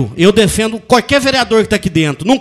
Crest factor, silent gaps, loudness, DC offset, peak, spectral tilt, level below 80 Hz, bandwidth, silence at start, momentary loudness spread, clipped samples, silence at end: 12 dB; none; -12 LUFS; under 0.1%; 0 dBFS; -4.5 dB/octave; -34 dBFS; 14.5 kHz; 0 s; 5 LU; 0.4%; 0 s